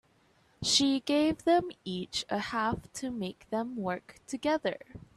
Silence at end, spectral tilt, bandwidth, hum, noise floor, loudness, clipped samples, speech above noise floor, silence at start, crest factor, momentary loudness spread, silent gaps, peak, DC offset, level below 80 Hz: 0.15 s; -3.5 dB/octave; 13 kHz; none; -66 dBFS; -31 LUFS; under 0.1%; 35 dB; 0.6 s; 20 dB; 13 LU; none; -12 dBFS; under 0.1%; -60 dBFS